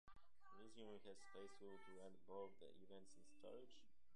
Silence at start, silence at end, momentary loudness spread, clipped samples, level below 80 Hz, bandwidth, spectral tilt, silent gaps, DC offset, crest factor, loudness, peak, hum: 0.05 s; 0 s; 8 LU; under 0.1%; -84 dBFS; 11 kHz; -4.5 dB/octave; none; 0.1%; 20 dB; -62 LUFS; -42 dBFS; none